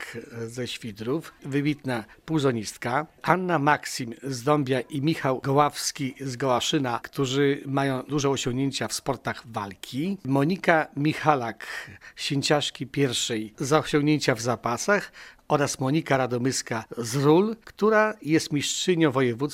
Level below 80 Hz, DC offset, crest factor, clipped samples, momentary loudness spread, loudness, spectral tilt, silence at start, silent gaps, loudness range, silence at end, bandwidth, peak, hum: -58 dBFS; under 0.1%; 22 dB; under 0.1%; 10 LU; -25 LUFS; -4.5 dB/octave; 0 s; none; 3 LU; 0 s; 16 kHz; -2 dBFS; none